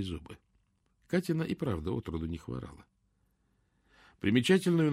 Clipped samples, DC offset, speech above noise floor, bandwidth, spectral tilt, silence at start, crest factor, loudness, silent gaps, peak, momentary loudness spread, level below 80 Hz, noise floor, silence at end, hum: under 0.1%; under 0.1%; 43 dB; 15.5 kHz; -6.5 dB/octave; 0 s; 20 dB; -32 LUFS; none; -14 dBFS; 17 LU; -54 dBFS; -74 dBFS; 0 s; none